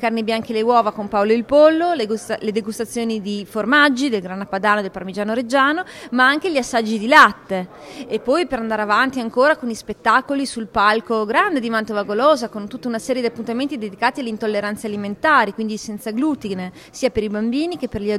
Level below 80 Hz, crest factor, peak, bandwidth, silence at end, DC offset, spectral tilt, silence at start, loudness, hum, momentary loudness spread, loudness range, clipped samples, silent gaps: -52 dBFS; 18 dB; 0 dBFS; 15.5 kHz; 0 s; under 0.1%; -4.5 dB/octave; 0 s; -19 LUFS; none; 12 LU; 4 LU; under 0.1%; none